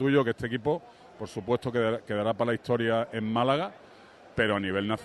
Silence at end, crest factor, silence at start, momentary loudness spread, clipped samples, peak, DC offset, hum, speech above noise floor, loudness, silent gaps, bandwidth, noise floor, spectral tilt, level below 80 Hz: 0 s; 18 dB; 0 s; 11 LU; under 0.1%; -12 dBFS; under 0.1%; none; 24 dB; -29 LUFS; none; 12 kHz; -52 dBFS; -7 dB/octave; -60 dBFS